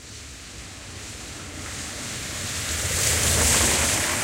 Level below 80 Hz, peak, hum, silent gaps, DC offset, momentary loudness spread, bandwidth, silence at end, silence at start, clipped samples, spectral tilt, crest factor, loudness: -38 dBFS; -4 dBFS; none; none; under 0.1%; 20 LU; 16 kHz; 0 s; 0 s; under 0.1%; -1.5 dB/octave; 20 dB; -22 LUFS